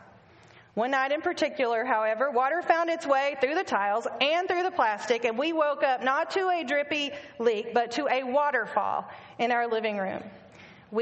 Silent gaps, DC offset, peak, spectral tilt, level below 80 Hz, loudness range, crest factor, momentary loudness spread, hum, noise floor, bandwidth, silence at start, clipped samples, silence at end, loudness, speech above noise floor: none; under 0.1%; -8 dBFS; -3.5 dB/octave; -74 dBFS; 2 LU; 18 dB; 6 LU; none; -55 dBFS; 8.2 kHz; 0.75 s; under 0.1%; 0 s; -27 LUFS; 28 dB